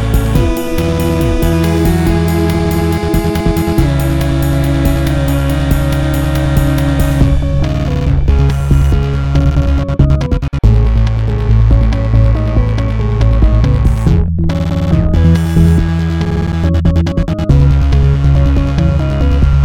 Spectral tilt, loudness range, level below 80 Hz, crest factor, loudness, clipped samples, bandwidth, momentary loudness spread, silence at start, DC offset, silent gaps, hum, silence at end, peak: -7.5 dB/octave; 1 LU; -14 dBFS; 10 dB; -12 LUFS; under 0.1%; 17.5 kHz; 4 LU; 0 s; 0.3%; none; none; 0 s; 0 dBFS